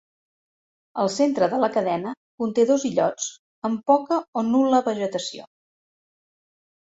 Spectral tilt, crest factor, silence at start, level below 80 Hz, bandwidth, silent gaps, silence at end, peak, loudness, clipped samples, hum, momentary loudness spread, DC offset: -4.5 dB/octave; 18 dB; 0.95 s; -70 dBFS; 8 kHz; 2.17-2.38 s, 3.39-3.62 s, 4.28-4.33 s; 1.4 s; -6 dBFS; -23 LUFS; under 0.1%; none; 11 LU; under 0.1%